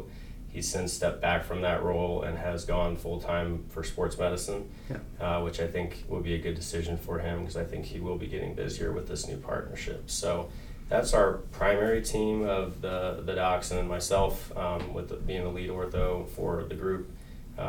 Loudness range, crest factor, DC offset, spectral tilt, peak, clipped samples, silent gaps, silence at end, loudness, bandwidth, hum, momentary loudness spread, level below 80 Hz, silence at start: 6 LU; 20 dB; under 0.1%; -5 dB/octave; -10 dBFS; under 0.1%; none; 0 s; -31 LUFS; 19 kHz; none; 9 LU; -40 dBFS; 0 s